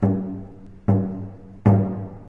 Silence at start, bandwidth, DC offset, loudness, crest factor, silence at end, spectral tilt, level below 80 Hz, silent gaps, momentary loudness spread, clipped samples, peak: 0 s; 3 kHz; under 0.1%; -23 LUFS; 18 dB; 0 s; -12 dB/octave; -46 dBFS; none; 18 LU; under 0.1%; -4 dBFS